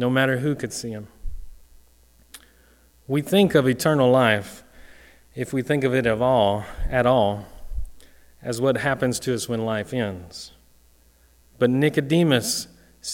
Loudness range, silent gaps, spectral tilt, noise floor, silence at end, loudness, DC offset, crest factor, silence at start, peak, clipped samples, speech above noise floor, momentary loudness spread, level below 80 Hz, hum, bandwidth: 5 LU; none; -5 dB/octave; -56 dBFS; 0 s; -22 LUFS; under 0.1%; 20 dB; 0 s; -4 dBFS; under 0.1%; 35 dB; 20 LU; -40 dBFS; none; 17.5 kHz